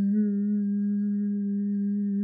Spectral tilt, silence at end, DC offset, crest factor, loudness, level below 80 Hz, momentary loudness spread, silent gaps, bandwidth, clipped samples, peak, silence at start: -14 dB/octave; 0 s; under 0.1%; 8 dB; -27 LUFS; under -90 dBFS; 3 LU; none; 1.9 kHz; under 0.1%; -18 dBFS; 0 s